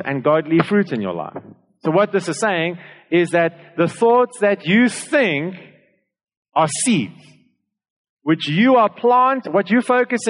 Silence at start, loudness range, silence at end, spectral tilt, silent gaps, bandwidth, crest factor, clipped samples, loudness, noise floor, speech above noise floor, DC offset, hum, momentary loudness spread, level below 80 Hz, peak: 0 s; 4 LU; 0 s; -5 dB/octave; 6.37-6.43 s, 7.90-8.17 s; 11 kHz; 16 dB; under 0.1%; -17 LUFS; -63 dBFS; 46 dB; under 0.1%; none; 11 LU; -70 dBFS; -4 dBFS